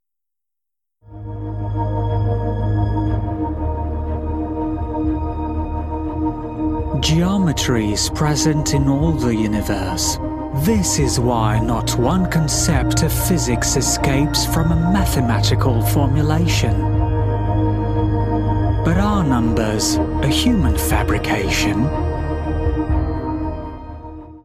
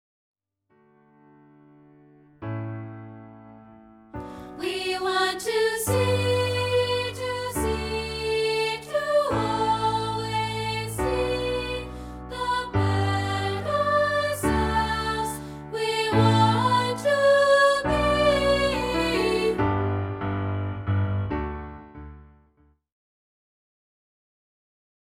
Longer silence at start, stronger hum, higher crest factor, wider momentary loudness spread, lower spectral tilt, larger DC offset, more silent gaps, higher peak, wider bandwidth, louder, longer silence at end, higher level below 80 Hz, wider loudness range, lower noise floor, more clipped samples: second, 1.1 s vs 2.4 s; neither; about the same, 16 dB vs 20 dB; second, 7 LU vs 16 LU; about the same, -5 dB/octave vs -5 dB/octave; neither; neither; first, -2 dBFS vs -6 dBFS; about the same, 15.5 kHz vs 16.5 kHz; first, -18 LUFS vs -24 LUFS; second, 0.05 s vs 2.9 s; first, -26 dBFS vs -42 dBFS; second, 5 LU vs 15 LU; first, -86 dBFS vs -65 dBFS; neither